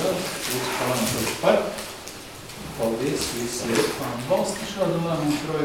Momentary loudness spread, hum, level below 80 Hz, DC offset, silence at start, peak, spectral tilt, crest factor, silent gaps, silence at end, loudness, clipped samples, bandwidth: 13 LU; none; -50 dBFS; 0.1%; 0 s; -6 dBFS; -4 dB/octave; 20 dB; none; 0 s; -25 LUFS; under 0.1%; 19 kHz